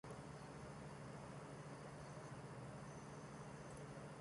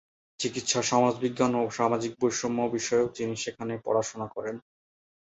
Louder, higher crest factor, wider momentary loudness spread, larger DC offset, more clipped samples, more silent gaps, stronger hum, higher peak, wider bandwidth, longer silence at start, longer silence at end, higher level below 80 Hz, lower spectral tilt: second, -55 LUFS vs -28 LUFS; second, 12 dB vs 20 dB; second, 1 LU vs 10 LU; neither; neither; neither; neither; second, -42 dBFS vs -10 dBFS; first, 11 kHz vs 8.2 kHz; second, 0.05 s vs 0.4 s; second, 0 s vs 0.7 s; about the same, -70 dBFS vs -66 dBFS; first, -5.5 dB/octave vs -4 dB/octave